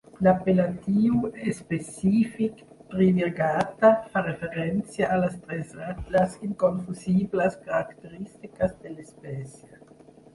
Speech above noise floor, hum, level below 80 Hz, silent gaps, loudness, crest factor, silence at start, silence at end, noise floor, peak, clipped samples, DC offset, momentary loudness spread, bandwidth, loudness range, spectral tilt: 26 dB; none; -54 dBFS; none; -25 LUFS; 18 dB; 0.15 s; 0.85 s; -52 dBFS; -6 dBFS; under 0.1%; under 0.1%; 17 LU; 11.5 kHz; 4 LU; -7.5 dB/octave